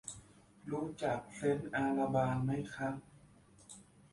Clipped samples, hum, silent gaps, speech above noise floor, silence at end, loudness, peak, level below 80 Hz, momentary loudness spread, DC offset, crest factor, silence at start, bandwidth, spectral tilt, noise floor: under 0.1%; none; none; 27 dB; 0.3 s; -37 LUFS; -20 dBFS; -66 dBFS; 21 LU; under 0.1%; 18 dB; 0.05 s; 11.5 kHz; -6.5 dB/octave; -63 dBFS